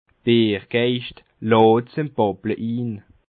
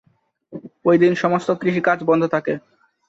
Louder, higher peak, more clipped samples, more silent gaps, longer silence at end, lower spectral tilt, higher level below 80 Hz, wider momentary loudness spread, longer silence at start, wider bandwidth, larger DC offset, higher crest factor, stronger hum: about the same, -20 LUFS vs -19 LUFS; about the same, -4 dBFS vs -4 dBFS; neither; neither; second, 0.35 s vs 0.5 s; first, -10 dB/octave vs -7.5 dB/octave; about the same, -60 dBFS vs -64 dBFS; second, 15 LU vs 20 LU; second, 0.25 s vs 0.5 s; second, 4.7 kHz vs 7.8 kHz; neither; about the same, 18 dB vs 16 dB; neither